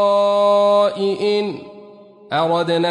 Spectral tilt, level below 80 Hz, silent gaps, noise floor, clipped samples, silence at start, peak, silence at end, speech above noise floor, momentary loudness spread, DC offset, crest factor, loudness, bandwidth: -5.5 dB/octave; -68 dBFS; none; -42 dBFS; under 0.1%; 0 s; -6 dBFS; 0 s; 25 dB; 10 LU; under 0.1%; 12 dB; -17 LUFS; 11 kHz